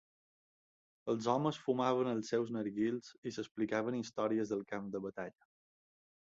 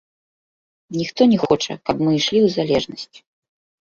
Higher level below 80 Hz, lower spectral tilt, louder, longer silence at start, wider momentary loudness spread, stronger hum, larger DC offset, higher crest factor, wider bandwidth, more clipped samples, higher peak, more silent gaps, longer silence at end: second, -78 dBFS vs -54 dBFS; about the same, -5.5 dB/octave vs -5.5 dB/octave; second, -37 LUFS vs -18 LUFS; first, 1.05 s vs 0.9 s; second, 11 LU vs 14 LU; neither; neither; about the same, 20 dB vs 18 dB; about the same, 7.6 kHz vs 7.4 kHz; neither; second, -18 dBFS vs -2 dBFS; first, 3.18-3.22 s vs none; first, 1 s vs 0.8 s